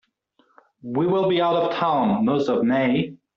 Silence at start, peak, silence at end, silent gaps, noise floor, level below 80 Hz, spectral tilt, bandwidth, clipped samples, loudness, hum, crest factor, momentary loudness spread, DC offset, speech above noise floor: 0.85 s; -8 dBFS; 0.2 s; none; -64 dBFS; -62 dBFS; -5 dB/octave; 7 kHz; under 0.1%; -21 LUFS; none; 14 dB; 5 LU; under 0.1%; 44 dB